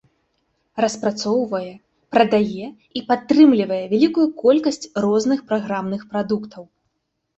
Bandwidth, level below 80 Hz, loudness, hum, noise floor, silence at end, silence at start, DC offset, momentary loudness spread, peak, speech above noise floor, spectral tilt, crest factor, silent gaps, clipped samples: 8.2 kHz; -60 dBFS; -19 LUFS; none; -73 dBFS; 0.75 s; 0.75 s; under 0.1%; 14 LU; -2 dBFS; 55 dB; -5.5 dB/octave; 18 dB; none; under 0.1%